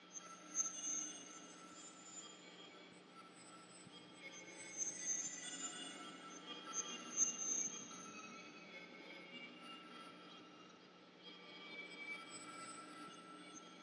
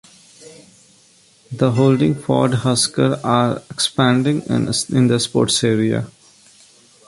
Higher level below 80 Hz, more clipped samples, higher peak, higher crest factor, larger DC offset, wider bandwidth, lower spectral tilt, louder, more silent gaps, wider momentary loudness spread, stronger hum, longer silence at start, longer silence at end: second, under -90 dBFS vs -52 dBFS; neither; second, -24 dBFS vs 0 dBFS; first, 26 dB vs 18 dB; neither; about the same, 11 kHz vs 11.5 kHz; second, -0.5 dB/octave vs -5 dB/octave; second, -46 LUFS vs -17 LUFS; neither; first, 18 LU vs 5 LU; neither; second, 0 s vs 0.4 s; second, 0 s vs 0.95 s